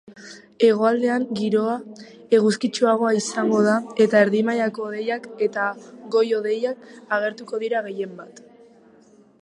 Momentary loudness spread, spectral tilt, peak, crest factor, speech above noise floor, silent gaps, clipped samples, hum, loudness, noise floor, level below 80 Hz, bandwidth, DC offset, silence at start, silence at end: 14 LU; -5 dB/octave; -4 dBFS; 18 dB; 31 dB; none; under 0.1%; none; -21 LUFS; -53 dBFS; -76 dBFS; 11 kHz; under 0.1%; 0.1 s; 1.05 s